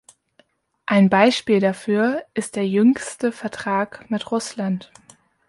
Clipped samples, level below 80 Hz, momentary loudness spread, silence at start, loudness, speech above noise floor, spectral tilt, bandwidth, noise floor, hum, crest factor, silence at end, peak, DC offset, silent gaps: under 0.1%; -64 dBFS; 11 LU; 0.9 s; -20 LUFS; 41 dB; -5.5 dB/octave; 11.5 kHz; -61 dBFS; none; 18 dB; 0.65 s; -2 dBFS; under 0.1%; none